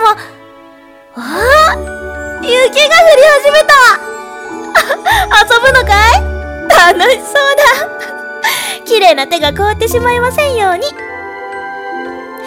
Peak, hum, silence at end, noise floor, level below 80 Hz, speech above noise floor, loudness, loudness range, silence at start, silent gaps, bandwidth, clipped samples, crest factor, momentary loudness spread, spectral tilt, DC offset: 0 dBFS; none; 0 s; -38 dBFS; -28 dBFS; 29 dB; -8 LUFS; 5 LU; 0 s; none; over 20 kHz; 4%; 10 dB; 17 LU; -2.5 dB/octave; under 0.1%